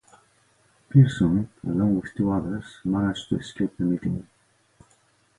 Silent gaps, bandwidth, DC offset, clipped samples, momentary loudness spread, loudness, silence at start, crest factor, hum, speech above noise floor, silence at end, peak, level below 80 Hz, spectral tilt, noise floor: none; 11 kHz; under 0.1%; under 0.1%; 12 LU; -24 LUFS; 0.95 s; 20 dB; none; 40 dB; 1.15 s; -4 dBFS; -50 dBFS; -8 dB/octave; -63 dBFS